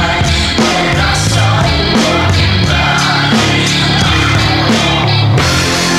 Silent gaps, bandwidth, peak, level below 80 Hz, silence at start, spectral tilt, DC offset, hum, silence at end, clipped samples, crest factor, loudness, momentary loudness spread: none; 15 kHz; 0 dBFS; -24 dBFS; 0 s; -4 dB/octave; under 0.1%; none; 0 s; under 0.1%; 10 dB; -10 LUFS; 1 LU